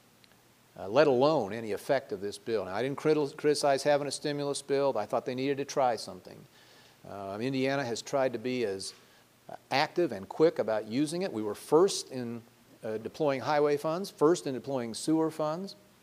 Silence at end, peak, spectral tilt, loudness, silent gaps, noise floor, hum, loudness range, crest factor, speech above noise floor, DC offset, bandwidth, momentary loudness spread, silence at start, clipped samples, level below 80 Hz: 0.3 s; -10 dBFS; -5 dB/octave; -30 LUFS; none; -62 dBFS; none; 4 LU; 22 dB; 32 dB; under 0.1%; 15.5 kHz; 13 LU; 0.8 s; under 0.1%; -76 dBFS